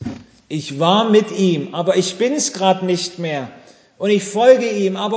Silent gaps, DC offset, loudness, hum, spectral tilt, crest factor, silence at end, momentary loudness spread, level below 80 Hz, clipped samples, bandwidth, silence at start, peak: none; under 0.1%; -17 LUFS; none; -4.5 dB/octave; 18 dB; 0 s; 14 LU; -58 dBFS; under 0.1%; 8 kHz; 0 s; 0 dBFS